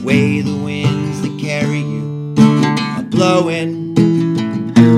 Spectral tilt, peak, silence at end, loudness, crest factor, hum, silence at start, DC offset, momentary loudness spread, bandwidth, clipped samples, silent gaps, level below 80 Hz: -7 dB/octave; 0 dBFS; 0 s; -15 LUFS; 14 dB; none; 0 s; under 0.1%; 9 LU; 11.5 kHz; 0.1%; none; -52 dBFS